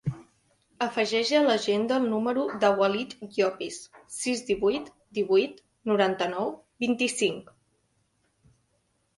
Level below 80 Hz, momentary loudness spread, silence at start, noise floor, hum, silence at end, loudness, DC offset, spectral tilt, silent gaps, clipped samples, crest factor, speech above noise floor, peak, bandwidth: -66 dBFS; 13 LU; 0.05 s; -72 dBFS; none; 1.75 s; -27 LUFS; under 0.1%; -4 dB/octave; none; under 0.1%; 20 dB; 46 dB; -8 dBFS; 11.5 kHz